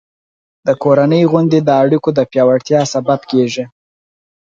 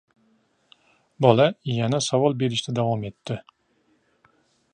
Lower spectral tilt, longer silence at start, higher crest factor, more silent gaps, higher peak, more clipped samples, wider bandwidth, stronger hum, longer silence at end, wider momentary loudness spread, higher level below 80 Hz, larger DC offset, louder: about the same, -6.5 dB/octave vs -5.5 dB/octave; second, 0.65 s vs 1.2 s; second, 14 dB vs 24 dB; neither; about the same, 0 dBFS vs 0 dBFS; neither; second, 7.6 kHz vs 9.8 kHz; neither; second, 0.8 s vs 1.35 s; second, 7 LU vs 15 LU; first, -56 dBFS vs -62 dBFS; neither; first, -13 LUFS vs -23 LUFS